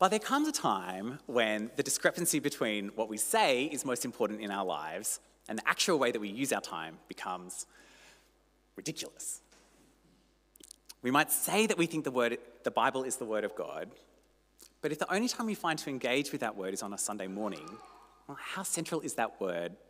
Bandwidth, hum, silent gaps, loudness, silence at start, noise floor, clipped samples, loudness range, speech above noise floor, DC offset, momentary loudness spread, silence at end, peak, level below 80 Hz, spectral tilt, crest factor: 16 kHz; 50 Hz at -70 dBFS; none; -33 LUFS; 0 s; -69 dBFS; under 0.1%; 9 LU; 35 dB; under 0.1%; 13 LU; 0.15 s; -12 dBFS; -72 dBFS; -3 dB/octave; 22 dB